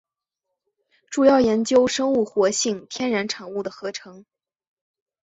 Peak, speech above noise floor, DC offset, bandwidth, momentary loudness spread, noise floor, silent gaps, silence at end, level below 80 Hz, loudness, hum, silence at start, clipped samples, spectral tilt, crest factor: -4 dBFS; 61 dB; under 0.1%; 8.2 kHz; 13 LU; -82 dBFS; none; 1.05 s; -60 dBFS; -21 LUFS; none; 1.1 s; under 0.1%; -3.5 dB/octave; 20 dB